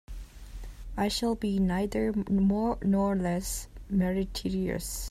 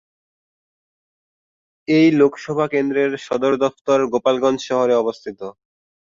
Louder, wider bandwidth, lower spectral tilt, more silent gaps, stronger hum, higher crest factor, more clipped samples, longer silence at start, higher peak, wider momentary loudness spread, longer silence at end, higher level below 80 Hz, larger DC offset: second, -29 LUFS vs -18 LUFS; first, 15.5 kHz vs 7.6 kHz; about the same, -5.5 dB/octave vs -6 dB/octave; second, none vs 3.81-3.85 s; neither; about the same, 14 dB vs 18 dB; neither; second, 0.1 s vs 1.9 s; second, -16 dBFS vs -2 dBFS; about the same, 19 LU vs 17 LU; second, 0 s vs 0.6 s; first, -42 dBFS vs -64 dBFS; neither